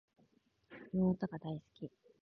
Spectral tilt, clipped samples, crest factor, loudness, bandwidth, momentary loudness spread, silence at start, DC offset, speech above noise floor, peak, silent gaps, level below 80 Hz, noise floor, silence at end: -9 dB/octave; under 0.1%; 18 dB; -38 LUFS; 4.9 kHz; 20 LU; 0.7 s; under 0.1%; 35 dB; -22 dBFS; none; -68 dBFS; -73 dBFS; 0.35 s